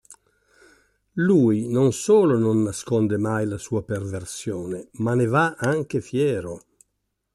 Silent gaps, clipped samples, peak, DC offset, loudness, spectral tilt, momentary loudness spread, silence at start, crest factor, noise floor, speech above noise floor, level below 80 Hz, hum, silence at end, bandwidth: none; under 0.1%; -8 dBFS; under 0.1%; -22 LUFS; -6.5 dB/octave; 13 LU; 0.1 s; 16 dB; -76 dBFS; 55 dB; -58 dBFS; none; 0.75 s; 13 kHz